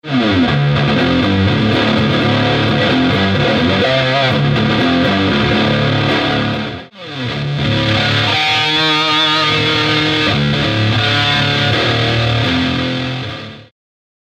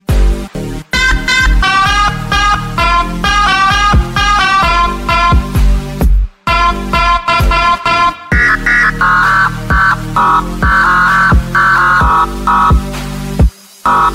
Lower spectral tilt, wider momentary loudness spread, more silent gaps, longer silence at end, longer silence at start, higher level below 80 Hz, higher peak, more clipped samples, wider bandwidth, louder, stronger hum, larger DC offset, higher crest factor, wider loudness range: about the same, -5.5 dB/octave vs -4.5 dB/octave; about the same, 7 LU vs 6 LU; neither; first, 0.6 s vs 0 s; about the same, 0.05 s vs 0.1 s; second, -38 dBFS vs -16 dBFS; second, -4 dBFS vs 0 dBFS; neither; second, 9.8 kHz vs 15.5 kHz; second, -13 LUFS vs -10 LUFS; neither; neither; about the same, 10 dB vs 10 dB; about the same, 3 LU vs 2 LU